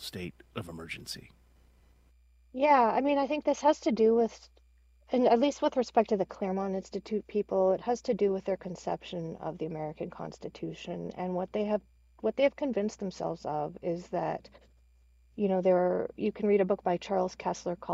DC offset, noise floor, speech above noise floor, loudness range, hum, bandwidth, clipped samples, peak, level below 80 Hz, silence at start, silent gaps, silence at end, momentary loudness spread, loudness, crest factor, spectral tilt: under 0.1%; -62 dBFS; 32 dB; 7 LU; none; 15.5 kHz; under 0.1%; -10 dBFS; -62 dBFS; 0 s; none; 0 s; 15 LU; -30 LUFS; 20 dB; -6 dB/octave